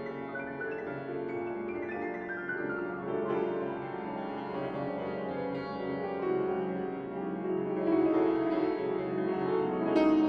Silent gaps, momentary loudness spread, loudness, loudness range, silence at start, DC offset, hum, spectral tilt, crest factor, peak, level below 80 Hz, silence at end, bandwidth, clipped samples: none; 9 LU; -33 LUFS; 4 LU; 0 s; under 0.1%; none; -8.5 dB/octave; 16 dB; -16 dBFS; -66 dBFS; 0 s; 6 kHz; under 0.1%